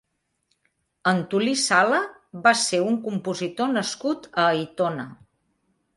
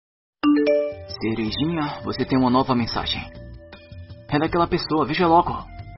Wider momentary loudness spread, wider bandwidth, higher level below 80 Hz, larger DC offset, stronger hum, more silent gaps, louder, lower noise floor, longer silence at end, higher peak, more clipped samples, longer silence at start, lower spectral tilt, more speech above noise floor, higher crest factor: second, 9 LU vs 22 LU; first, 11.5 kHz vs 6 kHz; second, -70 dBFS vs -44 dBFS; neither; neither; neither; about the same, -23 LUFS vs -22 LUFS; first, -73 dBFS vs -41 dBFS; first, 0.8 s vs 0 s; about the same, -4 dBFS vs -6 dBFS; neither; first, 1.05 s vs 0.45 s; about the same, -3.5 dB/octave vs -4.5 dB/octave; first, 50 dB vs 19 dB; about the same, 20 dB vs 18 dB